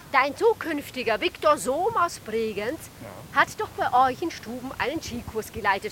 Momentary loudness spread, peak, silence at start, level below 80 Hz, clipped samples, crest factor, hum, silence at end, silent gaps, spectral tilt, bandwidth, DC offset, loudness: 11 LU; -6 dBFS; 0 s; -54 dBFS; under 0.1%; 20 dB; none; 0 s; none; -3.5 dB/octave; 17 kHz; under 0.1%; -25 LUFS